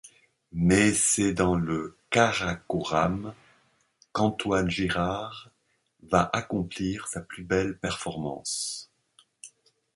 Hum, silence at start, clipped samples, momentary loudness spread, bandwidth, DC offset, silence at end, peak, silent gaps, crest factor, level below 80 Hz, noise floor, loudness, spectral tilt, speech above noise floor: none; 0.05 s; under 0.1%; 13 LU; 11.5 kHz; under 0.1%; 0.45 s; -6 dBFS; none; 22 dB; -48 dBFS; -71 dBFS; -27 LUFS; -4 dB/octave; 45 dB